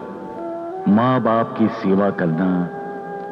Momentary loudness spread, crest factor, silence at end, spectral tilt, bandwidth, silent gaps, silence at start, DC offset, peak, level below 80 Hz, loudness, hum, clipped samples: 14 LU; 14 dB; 0 s; -9.5 dB/octave; 6 kHz; none; 0 s; under 0.1%; -6 dBFS; -64 dBFS; -20 LUFS; none; under 0.1%